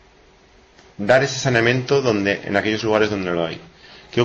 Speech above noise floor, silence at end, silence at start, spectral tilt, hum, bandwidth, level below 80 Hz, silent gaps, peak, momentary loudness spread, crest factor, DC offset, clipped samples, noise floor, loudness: 33 dB; 0 s; 1 s; -5 dB/octave; none; 8.6 kHz; -52 dBFS; none; -4 dBFS; 10 LU; 16 dB; under 0.1%; under 0.1%; -51 dBFS; -19 LUFS